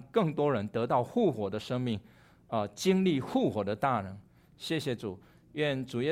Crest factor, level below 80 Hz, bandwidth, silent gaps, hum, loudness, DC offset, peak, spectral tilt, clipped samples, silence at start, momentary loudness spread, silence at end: 18 dB; -66 dBFS; 15.5 kHz; none; none; -31 LUFS; under 0.1%; -14 dBFS; -6.5 dB/octave; under 0.1%; 0 s; 13 LU; 0 s